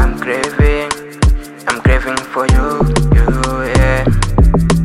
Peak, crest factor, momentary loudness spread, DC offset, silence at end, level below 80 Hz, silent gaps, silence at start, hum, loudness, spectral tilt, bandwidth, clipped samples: 0 dBFS; 12 dB; 6 LU; under 0.1%; 0 s; -16 dBFS; none; 0 s; none; -14 LUFS; -6 dB/octave; 14 kHz; under 0.1%